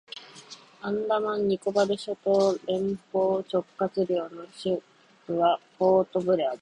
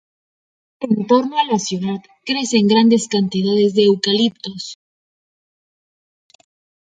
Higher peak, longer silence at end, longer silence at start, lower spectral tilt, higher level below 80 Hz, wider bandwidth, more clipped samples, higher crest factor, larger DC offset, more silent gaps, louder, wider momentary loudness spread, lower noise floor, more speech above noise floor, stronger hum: second, -10 dBFS vs -2 dBFS; second, 0.05 s vs 2.15 s; second, 0.15 s vs 0.8 s; about the same, -6 dB/octave vs -5 dB/octave; about the same, -68 dBFS vs -64 dBFS; first, 10.5 kHz vs 9.4 kHz; neither; about the same, 16 dB vs 16 dB; neither; neither; second, -27 LUFS vs -16 LUFS; about the same, 14 LU vs 15 LU; second, -49 dBFS vs under -90 dBFS; second, 23 dB vs over 74 dB; neither